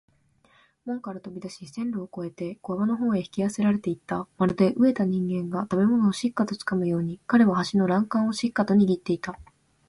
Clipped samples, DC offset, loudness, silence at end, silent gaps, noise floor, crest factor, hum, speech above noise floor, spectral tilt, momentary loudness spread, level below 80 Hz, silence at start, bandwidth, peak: under 0.1%; under 0.1%; -25 LUFS; 0.45 s; none; -62 dBFS; 16 dB; none; 38 dB; -7 dB/octave; 14 LU; -60 dBFS; 0.85 s; 11.5 kHz; -8 dBFS